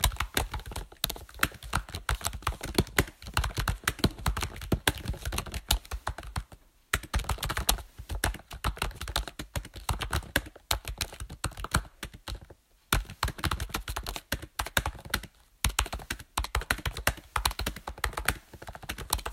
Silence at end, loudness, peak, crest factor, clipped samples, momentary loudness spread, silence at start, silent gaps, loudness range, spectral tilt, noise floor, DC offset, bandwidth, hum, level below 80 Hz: 0 s; -32 LUFS; -4 dBFS; 28 dB; under 0.1%; 10 LU; 0 s; none; 3 LU; -3 dB/octave; -56 dBFS; under 0.1%; 16.5 kHz; none; -38 dBFS